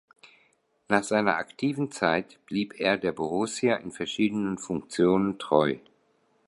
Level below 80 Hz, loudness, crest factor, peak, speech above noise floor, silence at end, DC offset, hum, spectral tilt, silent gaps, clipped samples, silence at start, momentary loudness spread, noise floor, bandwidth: -62 dBFS; -27 LUFS; 22 dB; -4 dBFS; 41 dB; 0.7 s; under 0.1%; none; -5 dB/octave; none; under 0.1%; 0.25 s; 8 LU; -68 dBFS; 11.5 kHz